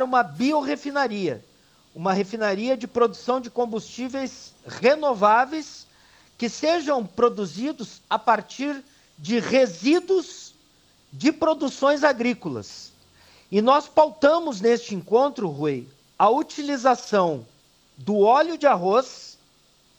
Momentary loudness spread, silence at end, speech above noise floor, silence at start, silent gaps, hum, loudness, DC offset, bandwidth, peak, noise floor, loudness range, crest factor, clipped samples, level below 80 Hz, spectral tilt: 15 LU; 0.7 s; 37 dB; 0 s; none; none; -22 LUFS; under 0.1%; 19 kHz; -4 dBFS; -59 dBFS; 4 LU; 18 dB; under 0.1%; -66 dBFS; -5 dB/octave